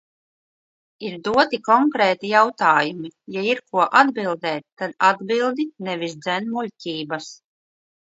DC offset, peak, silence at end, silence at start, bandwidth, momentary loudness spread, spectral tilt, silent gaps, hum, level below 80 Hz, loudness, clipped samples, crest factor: under 0.1%; 0 dBFS; 0.85 s; 1 s; 8 kHz; 14 LU; -4.5 dB/octave; 4.72-4.77 s; none; -66 dBFS; -20 LUFS; under 0.1%; 22 dB